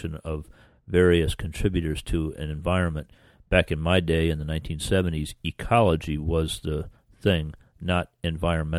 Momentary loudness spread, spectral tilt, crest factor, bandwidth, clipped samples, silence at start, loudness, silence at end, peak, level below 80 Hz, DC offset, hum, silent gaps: 12 LU; -6 dB/octave; 20 dB; 13.5 kHz; under 0.1%; 0 s; -26 LUFS; 0 s; -6 dBFS; -36 dBFS; under 0.1%; none; none